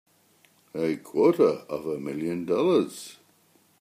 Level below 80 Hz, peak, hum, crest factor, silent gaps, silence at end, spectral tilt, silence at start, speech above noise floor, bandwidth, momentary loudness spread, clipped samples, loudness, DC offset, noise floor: -72 dBFS; -8 dBFS; none; 20 dB; none; 0.7 s; -6.5 dB/octave; 0.75 s; 38 dB; 15.5 kHz; 15 LU; under 0.1%; -26 LUFS; under 0.1%; -63 dBFS